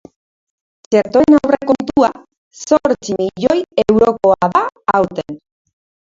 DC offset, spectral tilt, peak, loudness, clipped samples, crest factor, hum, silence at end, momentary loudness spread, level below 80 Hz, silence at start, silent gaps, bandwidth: under 0.1%; -6 dB/octave; 0 dBFS; -14 LUFS; under 0.1%; 16 dB; none; 0.75 s; 9 LU; -48 dBFS; 0.9 s; 2.38-2.51 s; 7.8 kHz